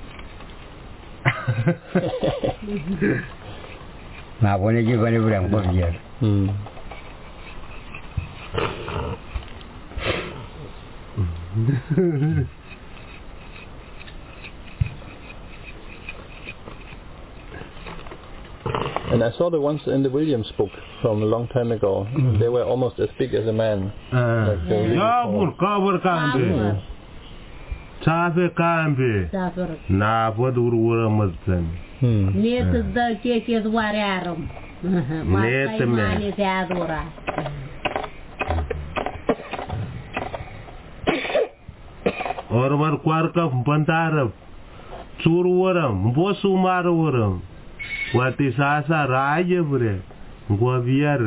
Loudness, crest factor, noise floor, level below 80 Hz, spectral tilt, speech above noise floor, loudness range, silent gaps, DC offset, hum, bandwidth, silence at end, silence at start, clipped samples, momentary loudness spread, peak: -22 LUFS; 20 dB; -41 dBFS; -38 dBFS; -11.5 dB/octave; 21 dB; 9 LU; none; under 0.1%; none; 4 kHz; 0 s; 0 s; under 0.1%; 20 LU; -4 dBFS